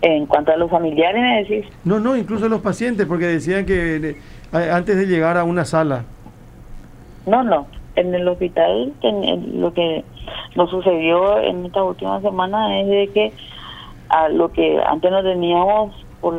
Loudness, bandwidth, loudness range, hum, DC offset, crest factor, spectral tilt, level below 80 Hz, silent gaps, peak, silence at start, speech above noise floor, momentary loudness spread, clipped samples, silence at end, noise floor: -18 LUFS; 11 kHz; 2 LU; none; under 0.1%; 18 dB; -6.5 dB/octave; -42 dBFS; none; 0 dBFS; 0 s; 22 dB; 9 LU; under 0.1%; 0 s; -40 dBFS